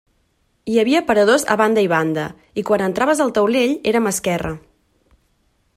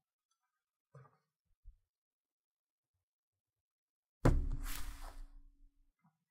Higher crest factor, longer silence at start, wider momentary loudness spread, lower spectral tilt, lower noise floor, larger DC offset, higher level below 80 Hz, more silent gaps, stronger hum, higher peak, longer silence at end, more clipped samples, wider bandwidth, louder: second, 18 dB vs 28 dB; second, 0.65 s vs 0.95 s; second, 12 LU vs 21 LU; second, -4.5 dB/octave vs -6.5 dB/octave; second, -64 dBFS vs -79 dBFS; neither; about the same, -50 dBFS vs -46 dBFS; second, none vs 1.40-1.45 s, 1.57-1.63 s, 1.90-2.25 s, 2.32-2.94 s, 3.03-3.33 s, 3.40-3.45 s, 3.60-4.03 s, 4.09-4.21 s; neither; first, -2 dBFS vs -16 dBFS; first, 1.2 s vs 0.9 s; neither; about the same, 16 kHz vs 16 kHz; first, -17 LUFS vs -39 LUFS